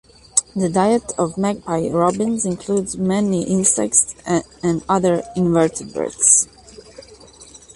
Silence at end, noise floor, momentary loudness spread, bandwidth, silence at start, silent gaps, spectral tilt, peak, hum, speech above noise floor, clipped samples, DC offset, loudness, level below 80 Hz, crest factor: 0.2 s; -43 dBFS; 9 LU; 11.5 kHz; 0.35 s; none; -4.5 dB/octave; 0 dBFS; none; 25 dB; under 0.1%; under 0.1%; -18 LUFS; -50 dBFS; 18 dB